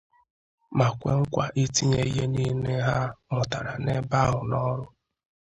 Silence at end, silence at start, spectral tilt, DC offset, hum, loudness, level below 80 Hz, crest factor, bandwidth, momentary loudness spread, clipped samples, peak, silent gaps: 0.75 s; 0.7 s; -5.5 dB/octave; under 0.1%; none; -26 LUFS; -48 dBFS; 20 dB; 8.2 kHz; 6 LU; under 0.1%; -6 dBFS; none